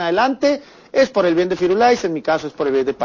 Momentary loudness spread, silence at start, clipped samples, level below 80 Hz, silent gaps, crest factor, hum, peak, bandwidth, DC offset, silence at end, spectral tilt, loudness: 6 LU; 0 s; under 0.1%; -54 dBFS; none; 14 dB; none; -4 dBFS; 7.4 kHz; under 0.1%; 0 s; -5 dB/octave; -18 LUFS